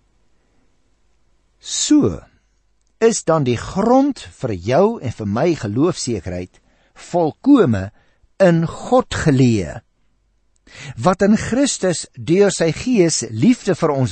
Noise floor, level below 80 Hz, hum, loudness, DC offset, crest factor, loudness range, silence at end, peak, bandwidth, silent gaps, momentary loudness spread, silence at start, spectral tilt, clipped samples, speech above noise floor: -62 dBFS; -46 dBFS; none; -17 LUFS; under 0.1%; 16 dB; 3 LU; 0 s; -2 dBFS; 8.8 kHz; none; 12 LU; 1.65 s; -5.5 dB/octave; under 0.1%; 46 dB